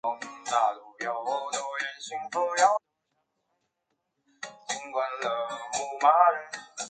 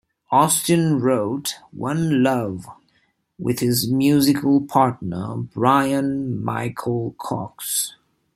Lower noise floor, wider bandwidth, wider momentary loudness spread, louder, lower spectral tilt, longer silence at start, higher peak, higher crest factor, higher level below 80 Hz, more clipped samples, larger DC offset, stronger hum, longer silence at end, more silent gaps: first, -80 dBFS vs -65 dBFS; second, 9.4 kHz vs 16 kHz; about the same, 14 LU vs 12 LU; second, -28 LUFS vs -20 LUFS; second, -0.5 dB/octave vs -5 dB/octave; second, 0.05 s vs 0.3 s; second, -8 dBFS vs -2 dBFS; about the same, 22 dB vs 18 dB; second, -84 dBFS vs -58 dBFS; neither; neither; neither; second, 0 s vs 0.45 s; neither